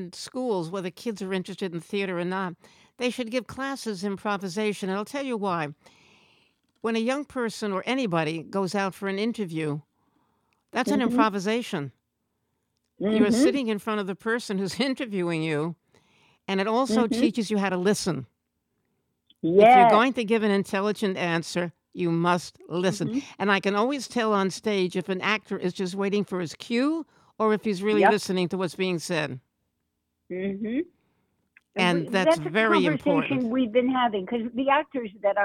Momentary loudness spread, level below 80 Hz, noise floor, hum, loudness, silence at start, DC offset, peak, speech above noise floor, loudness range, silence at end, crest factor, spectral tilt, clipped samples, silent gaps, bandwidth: 10 LU; -68 dBFS; -78 dBFS; none; -25 LUFS; 0 s; under 0.1%; -6 dBFS; 53 dB; 9 LU; 0 s; 20 dB; -5.5 dB/octave; under 0.1%; none; 15.5 kHz